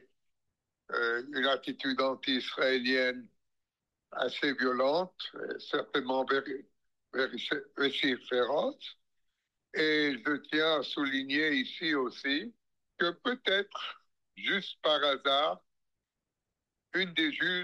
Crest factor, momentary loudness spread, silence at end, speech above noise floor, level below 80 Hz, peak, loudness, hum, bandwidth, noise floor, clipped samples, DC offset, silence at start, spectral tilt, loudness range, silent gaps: 18 dB; 11 LU; 0 s; 57 dB; -84 dBFS; -16 dBFS; -31 LUFS; none; 11.5 kHz; -88 dBFS; under 0.1%; under 0.1%; 0.9 s; -4.5 dB/octave; 2 LU; none